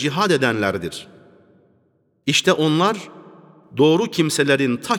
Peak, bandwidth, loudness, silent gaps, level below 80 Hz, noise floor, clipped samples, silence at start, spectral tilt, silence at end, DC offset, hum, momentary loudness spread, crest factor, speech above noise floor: -4 dBFS; 18.5 kHz; -18 LUFS; none; -62 dBFS; -63 dBFS; under 0.1%; 0 s; -4.5 dB/octave; 0 s; under 0.1%; none; 14 LU; 18 dB; 44 dB